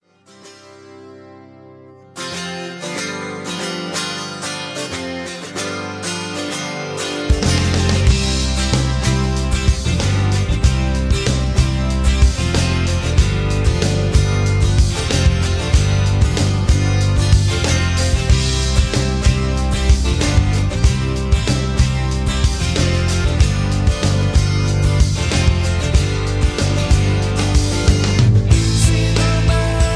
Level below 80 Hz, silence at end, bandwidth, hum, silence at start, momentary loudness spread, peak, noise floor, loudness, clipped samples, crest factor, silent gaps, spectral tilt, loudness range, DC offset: -20 dBFS; 0 s; 11 kHz; none; 0.45 s; 9 LU; 0 dBFS; -44 dBFS; -17 LUFS; under 0.1%; 14 dB; none; -5 dB/octave; 8 LU; under 0.1%